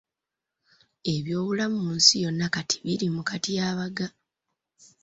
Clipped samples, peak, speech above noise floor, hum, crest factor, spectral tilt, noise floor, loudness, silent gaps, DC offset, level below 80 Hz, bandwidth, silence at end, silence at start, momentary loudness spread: under 0.1%; -4 dBFS; 61 dB; none; 24 dB; -3.5 dB/octave; -87 dBFS; -25 LUFS; none; under 0.1%; -64 dBFS; 8 kHz; 0.95 s; 1.05 s; 13 LU